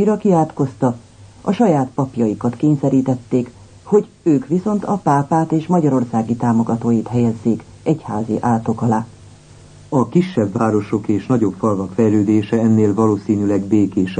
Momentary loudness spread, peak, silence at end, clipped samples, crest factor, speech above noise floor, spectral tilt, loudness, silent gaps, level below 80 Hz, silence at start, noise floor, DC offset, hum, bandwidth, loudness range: 6 LU; -2 dBFS; 0 s; under 0.1%; 14 dB; 26 dB; -8.5 dB/octave; -17 LUFS; none; -52 dBFS; 0 s; -42 dBFS; under 0.1%; none; 9.4 kHz; 3 LU